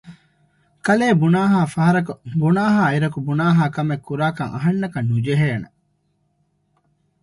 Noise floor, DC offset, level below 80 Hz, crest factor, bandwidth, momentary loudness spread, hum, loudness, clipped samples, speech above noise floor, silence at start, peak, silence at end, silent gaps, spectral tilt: -66 dBFS; under 0.1%; -56 dBFS; 16 dB; 11.5 kHz; 7 LU; 50 Hz at -40 dBFS; -19 LUFS; under 0.1%; 48 dB; 0.05 s; -4 dBFS; 1.55 s; none; -7.5 dB/octave